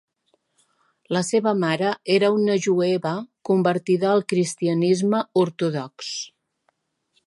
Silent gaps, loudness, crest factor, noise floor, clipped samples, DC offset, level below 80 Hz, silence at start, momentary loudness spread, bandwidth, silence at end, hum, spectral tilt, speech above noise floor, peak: none; -22 LUFS; 16 dB; -70 dBFS; under 0.1%; under 0.1%; -72 dBFS; 1.1 s; 10 LU; 11.5 kHz; 1 s; none; -5.5 dB/octave; 49 dB; -6 dBFS